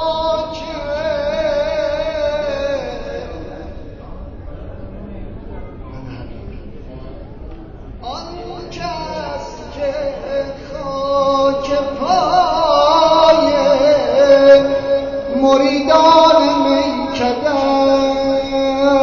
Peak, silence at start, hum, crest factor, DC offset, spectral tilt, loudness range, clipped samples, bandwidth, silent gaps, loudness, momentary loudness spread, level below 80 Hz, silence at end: 0 dBFS; 0 s; none; 16 dB; 0.1%; -3 dB/octave; 21 LU; under 0.1%; 7 kHz; none; -14 LUFS; 23 LU; -36 dBFS; 0 s